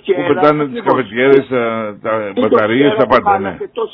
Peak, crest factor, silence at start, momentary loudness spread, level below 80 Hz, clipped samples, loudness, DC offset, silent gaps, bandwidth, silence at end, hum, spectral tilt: 0 dBFS; 14 dB; 0.05 s; 8 LU; -52 dBFS; 0.2%; -13 LUFS; under 0.1%; none; 5.4 kHz; 0.05 s; none; -8.5 dB/octave